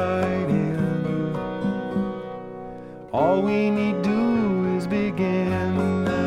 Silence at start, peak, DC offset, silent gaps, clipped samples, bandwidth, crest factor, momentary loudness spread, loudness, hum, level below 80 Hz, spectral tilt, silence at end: 0 s; -8 dBFS; under 0.1%; none; under 0.1%; 10.5 kHz; 14 dB; 13 LU; -23 LUFS; none; -52 dBFS; -8 dB/octave; 0 s